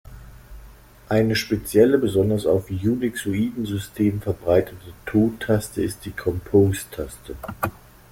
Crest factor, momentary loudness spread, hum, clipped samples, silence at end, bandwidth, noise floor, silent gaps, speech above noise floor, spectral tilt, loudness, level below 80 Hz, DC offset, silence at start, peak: 18 dB; 12 LU; none; under 0.1%; 0.4 s; 16.5 kHz; -46 dBFS; none; 24 dB; -6.5 dB/octave; -22 LUFS; -46 dBFS; under 0.1%; 0.05 s; -4 dBFS